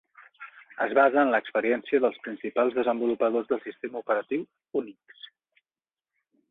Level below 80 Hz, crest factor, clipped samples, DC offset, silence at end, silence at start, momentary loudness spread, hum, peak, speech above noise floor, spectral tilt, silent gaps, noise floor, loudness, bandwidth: -76 dBFS; 20 dB; under 0.1%; under 0.1%; 1.6 s; 0.2 s; 24 LU; none; -8 dBFS; over 64 dB; -7.5 dB/octave; none; under -90 dBFS; -26 LUFS; 4.1 kHz